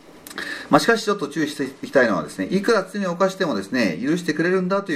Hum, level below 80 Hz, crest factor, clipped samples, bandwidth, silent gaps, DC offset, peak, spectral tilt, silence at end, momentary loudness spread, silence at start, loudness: none; -62 dBFS; 20 dB; under 0.1%; 15.5 kHz; none; under 0.1%; -2 dBFS; -5 dB/octave; 0 s; 9 LU; 0.15 s; -21 LUFS